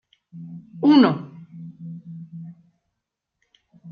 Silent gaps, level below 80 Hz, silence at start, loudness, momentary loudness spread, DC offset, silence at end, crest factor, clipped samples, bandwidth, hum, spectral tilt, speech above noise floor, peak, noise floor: none; -72 dBFS; 0.35 s; -18 LUFS; 25 LU; under 0.1%; 0 s; 20 dB; under 0.1%; 5.2 kHz; none; -8.5 dB/octave; 61 dB; -4 dBFS; -81 dBFS